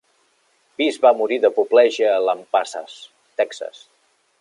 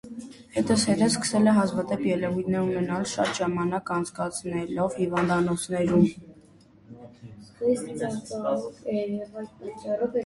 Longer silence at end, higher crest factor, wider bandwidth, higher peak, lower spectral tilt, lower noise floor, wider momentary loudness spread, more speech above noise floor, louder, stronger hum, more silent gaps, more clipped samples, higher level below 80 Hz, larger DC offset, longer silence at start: first, 0.7 s vs 0 s; about the same, 18 dB vs 18 dB; about the same, 11 kHz vs 12 kHz; first, -2 dBFS vs -8 dBFS; second, -2.5 dB/octave vs -5.5 dB/octave; first, -63 dBFS vs -54 dBFS; first, 19 LU vs 16 LU; first, 44 dB vs 29 dB; first, -18 LUFS vs -26 LUFS; neither; neither; neither; second, -80 dBFS vs -58 dBFS; neither; first, 0.8 s vs 0.05 s